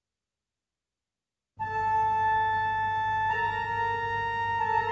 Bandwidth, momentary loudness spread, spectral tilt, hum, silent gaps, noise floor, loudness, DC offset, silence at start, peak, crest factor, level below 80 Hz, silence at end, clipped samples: 7.4 kHz; 4 LU; -1.5 dB/octave; none; none; under -90 dBFS; -27 LUFS; under 0.1%; 1.6 s; -16 dBFS; 14 dB; -56 dBFS; 0 s; under 0.1%